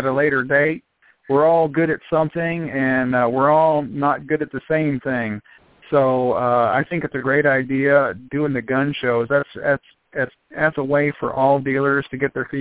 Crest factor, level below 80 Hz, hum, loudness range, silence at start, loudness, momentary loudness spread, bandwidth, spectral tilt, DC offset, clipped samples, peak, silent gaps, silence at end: 18 dB; -56 dBFS; none; 2 LU; 0 s; -19 LUFS; 8 LU; 4 kHz; -10.5 dB/octave; under 0.1%; under 0.1%; -2 dBFS; none; 0 s